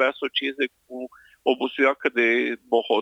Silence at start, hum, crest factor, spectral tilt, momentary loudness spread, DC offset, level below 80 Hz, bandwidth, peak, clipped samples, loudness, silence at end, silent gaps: 0 s; none; 18 dB; -4 dB/octave; 17 LU; under 0.1%; -74 dBFS; 9 kHz; -6 dBFS; under 0.1%; -23 LUFS; 0 s; none